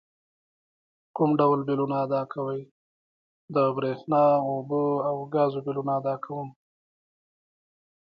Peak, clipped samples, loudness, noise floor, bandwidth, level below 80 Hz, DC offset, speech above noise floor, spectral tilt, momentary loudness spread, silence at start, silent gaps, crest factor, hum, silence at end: -10 dBFS; under 0.1%; -26 LUFS; under -90 dBFS; 5.4 kHz; -76 dBFS; under 0.1%; over 65 dB; -10.5 dB/octave; 11 LU; 1.15 s; 2.71-3.48 s; 18 dB; none; 1.7 s